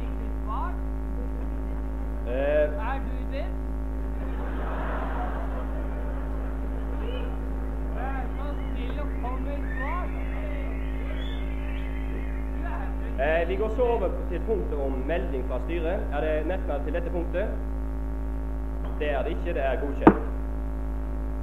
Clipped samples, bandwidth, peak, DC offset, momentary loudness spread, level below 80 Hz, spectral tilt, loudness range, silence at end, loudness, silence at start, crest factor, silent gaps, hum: under 0.1%; 4.1 kHz; -2 dBFS; 1%; 8 LU; -30 dBFS; -8.5 dB/octave; 5 LU; 0 s; -30 LUFS; 0 s; 26 dB; none; 50 Hz at -50 dBFS